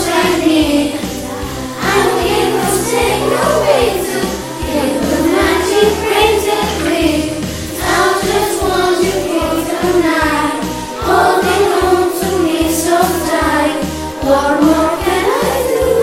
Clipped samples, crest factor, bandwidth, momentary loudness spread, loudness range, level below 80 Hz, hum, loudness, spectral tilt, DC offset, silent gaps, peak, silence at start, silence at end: under 0.1%; 14 dB; 16.5 kHz; 8 LU; 1 LU; -32 dBFS; none; -13 LUFS; -4 dB/octave; under 0.1%; none; 0 dBFS; 0 s; 0 s